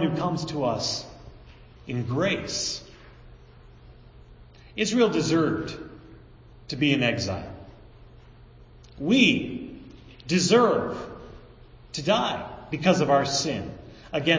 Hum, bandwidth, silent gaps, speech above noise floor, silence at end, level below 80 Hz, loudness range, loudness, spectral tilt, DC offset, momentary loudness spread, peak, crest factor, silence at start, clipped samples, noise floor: none; 7.6 kHz; none; 26 dB; 0 s; -50 dBFS; 6 LU; -25 LUFS; -4.5 dB/octave; under 0.1%; 22 LU; -6 dBFS; 20 dB; 0 s; under 0.1%; -49 dBFS